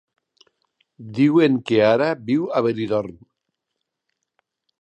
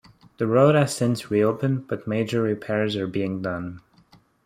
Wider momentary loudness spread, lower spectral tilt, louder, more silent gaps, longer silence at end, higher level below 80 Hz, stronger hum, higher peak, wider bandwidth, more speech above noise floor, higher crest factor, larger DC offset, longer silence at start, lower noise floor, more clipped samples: about the same, 9 LU vs 11 LU; about the same, -7.5 dB/octave vs -6.5 dB/octave; first, -19 LUFS vs -23 LUFS; neither; first, 1.7 s vs 0.7 s; about the same, -64 dBFS vs -62 dBFS; neither; about the same, -4 dBFS vs -6 dBFS; second, 8.6 kHz vs 15 kHz; first, 61 dB vs 34 dB; about the same, 18 dB vs 18 dB; neither; first, 1 s vs 0.4 s; first, -80 dBFS vs -57 dBFS; neither